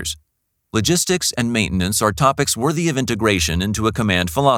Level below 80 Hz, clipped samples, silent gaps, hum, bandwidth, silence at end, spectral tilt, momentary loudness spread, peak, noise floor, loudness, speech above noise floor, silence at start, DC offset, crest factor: -38 dBFS; under 0.1%; none; none; 19 kHz; 0 s; -4 dB/octave; 4 LU; -2 dBFS; -71 dBFS; -18 LUFS; 53 dB; 0 s; under 0.1%; 18 dB